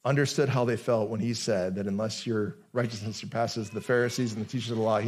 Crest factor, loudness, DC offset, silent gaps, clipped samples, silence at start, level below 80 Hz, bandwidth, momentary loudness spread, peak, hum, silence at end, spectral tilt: 16 dB; -29 LUFS; under 0.1%; none; under 0.1%; 0.05 s; -72 dBFS; 14.5 kHz; 7 LU; -12 dBFS; none; 0 s; -5.5 dB/octave